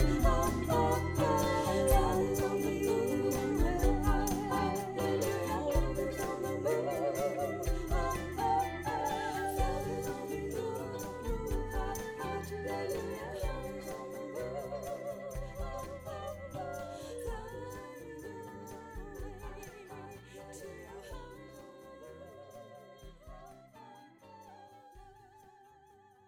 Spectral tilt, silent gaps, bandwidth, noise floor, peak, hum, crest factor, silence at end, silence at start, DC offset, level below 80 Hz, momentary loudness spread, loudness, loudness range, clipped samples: -5.5 dB/octave; none; 20 kHz; -62 dBFS; -14 dBFS; none; 20 dB; 0.8 s; 0 s; under 0.1%; -42 dBFS; 21 LU; -35 LUFS; 20 LU; under 0.1%